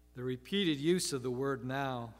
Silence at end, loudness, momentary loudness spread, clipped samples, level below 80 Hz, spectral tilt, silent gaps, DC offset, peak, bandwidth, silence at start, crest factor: 0 s; -34 LUFS; 7 LU; under 0.1%; -64 dBFS; -4.5 dB/octave; none; under 0.1%; -18 dBFS; 16 kHz; 0.15 s; 16 dB